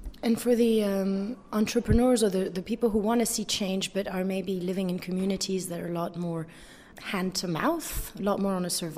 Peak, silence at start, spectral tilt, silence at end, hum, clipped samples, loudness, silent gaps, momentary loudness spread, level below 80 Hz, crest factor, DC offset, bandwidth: -10 dBFS; 0 s; -5 dB/octave; 0 s; none; under 0.1%; -28 LUFS; none; 9 LU; -44 dBFS; 18 dB; under 0.1%; 16 kHz